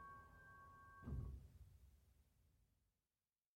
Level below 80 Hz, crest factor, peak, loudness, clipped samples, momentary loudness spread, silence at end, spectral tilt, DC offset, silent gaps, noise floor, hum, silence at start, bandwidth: -62 dBFS; 20 dB; -38 dBFS; -58 LUFS; under 0.1%; 14 LU; 0.9 s; -8 dB/octave; under 0.1%; none; under -90 dBFS; none; 0 s; 16 kHz